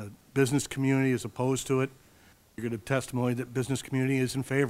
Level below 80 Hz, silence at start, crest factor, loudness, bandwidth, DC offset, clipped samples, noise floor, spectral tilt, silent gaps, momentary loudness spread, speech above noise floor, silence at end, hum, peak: -60 dBFS; 0 s; 18 dB; -29 LUFS; 16 kHz; under 0.1%; under 0.1%; -59 dBFS; -6 dB/octave; none; 8 LU; 31 dB; 0 s; none; -10 dBFS